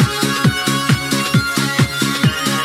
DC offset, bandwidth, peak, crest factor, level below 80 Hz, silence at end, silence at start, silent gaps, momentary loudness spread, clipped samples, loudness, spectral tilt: under 0.1%; 16.5 kHz; -2 dBFS; 14 dB; -40 dBFS; 0 s; 0 s; none; 1 LU; under 0.1%; -16 LUFS; -4 dB/octave